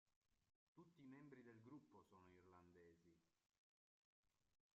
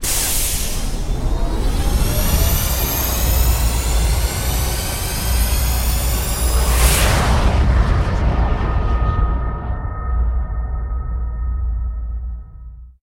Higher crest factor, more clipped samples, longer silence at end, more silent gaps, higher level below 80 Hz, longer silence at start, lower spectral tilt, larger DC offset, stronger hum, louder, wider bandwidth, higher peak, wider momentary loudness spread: about the same, 18 dB vs 16 dB; neither; about the same, 0.2 s vs 0.15 s; first, 0.16-0.22 s, 0.55-0.75 s, 3.58-4.23 s vs none; second, under -90 dBFS vs -18 dBFS; about the same, 0.05 s vs 0 s; first, -6.5 dB/octave vs -4 dB/octave; neither; neither; second, -66 LUFS vs -19 LUFS; second, 7 kHz vs 16.5 kHz; second, -52 dBFS vs -2 dBFS; second, 2 LU vs 9 LU